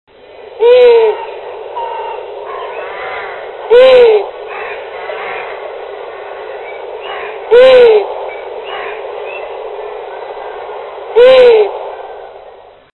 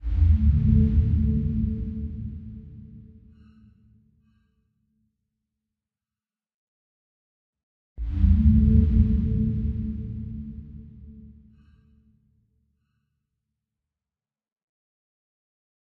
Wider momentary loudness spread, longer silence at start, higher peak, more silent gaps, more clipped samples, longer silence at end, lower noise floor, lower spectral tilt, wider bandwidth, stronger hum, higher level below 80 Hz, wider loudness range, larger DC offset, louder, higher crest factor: second, 20 LU vs 23 LU; first, 0.4 s vs 0 s; first, 0 dBFS vs -6 dBFS; second, none vs 6.54-7.53 s, 7.63-7.96 s; first, 0.2% vs under 0.1%; second, 0.45 s vs 4.7 s; second, -37 dBFS vs under -90 dBFS; second, -4 dB/octave vs -12.5 dB/octave; first, 4.2 kHz vs 2.8 kHz; neither; second, -50 dBFS vs -30 dBFS; second, 5 LU vs 19 LU; neither; first, -9 LUFS vs -23 LUFS; second, 12 dB vs 20 dB